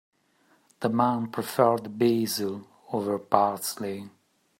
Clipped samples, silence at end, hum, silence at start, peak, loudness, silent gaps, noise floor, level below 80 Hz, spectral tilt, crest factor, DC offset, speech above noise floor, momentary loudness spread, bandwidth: under 0.1%; 0.5 s; none; 0.8 s; -2 dBFS; -27 LUFS; none; -65 dBFS; -74 dBFS; -5 dB/octave; 24 dB; under 0.1%; 39 dB; 11 LU; 16.5 kHz